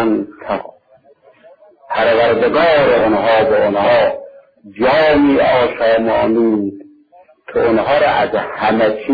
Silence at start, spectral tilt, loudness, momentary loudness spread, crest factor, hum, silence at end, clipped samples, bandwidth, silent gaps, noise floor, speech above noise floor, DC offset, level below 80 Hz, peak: 0 s; -8 dB/octave; -14 LUFS; 11 LU; 12 dB; none; 0 s; under 0.1%; 5 kHz; none; -49 dBFS; 36 dB; under 0.1%; -46 dBFS; -2 dBFS